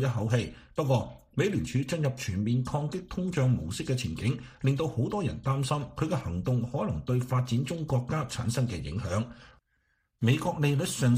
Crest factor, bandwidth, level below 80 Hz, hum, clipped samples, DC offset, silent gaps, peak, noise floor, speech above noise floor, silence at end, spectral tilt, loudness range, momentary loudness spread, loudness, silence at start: 18 dB; 15.5 kHz; -50 dBFS; none; under 0.1%; under 0.1%; none; -12 dBFS; -74 dBFS; 45 dB; 0 s; -6.5 dB/octave; 1 LU; 5 LU; -30 LUFS; 0 s